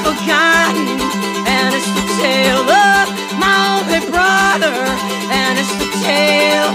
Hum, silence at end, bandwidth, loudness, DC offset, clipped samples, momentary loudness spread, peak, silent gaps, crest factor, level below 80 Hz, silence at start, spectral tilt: none; 0 s; 16 kHz; -13 LUFS; under 0.1%; under 0.1%; 7 LU; -2 dBFS; none; 10 dB; -42 dBFS; 0 s; -3 dB/octave